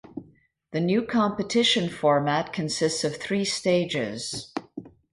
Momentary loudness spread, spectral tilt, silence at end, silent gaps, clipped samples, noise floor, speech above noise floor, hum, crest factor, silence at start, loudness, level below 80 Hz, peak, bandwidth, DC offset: 14 LU; -4 dB/octave; 0.25 s; none; under 0.1%; -58 dBFS; 34 dB; none; 16 dB; 0.15 s; -25 LUFS; -62 dBFS; -10 dBFS; 11.5 kHz; under 0.1%